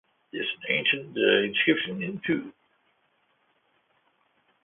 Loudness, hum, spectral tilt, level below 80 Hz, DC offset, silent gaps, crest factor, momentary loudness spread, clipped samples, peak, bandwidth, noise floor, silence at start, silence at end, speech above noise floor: -25 LUFS; none; -8.5 dB/octave; -70 dBFS; under 0.1%; none; 22 dB; 10 LU; under 0.1%; -6 dBFS; 4 kHz; -70 dBFS; 0.35 s; 2.1 s; 43 dB